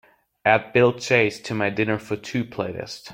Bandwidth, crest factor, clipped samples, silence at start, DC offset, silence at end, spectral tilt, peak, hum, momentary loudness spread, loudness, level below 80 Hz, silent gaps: 16.5 kHz; 22 dB; under 0.1%; 0.45 s; under 0.1%; 0 s; -5.5 dB/octave; -2 dBFS; none; 11 LU; -22 LUFS; -60 dBFS; none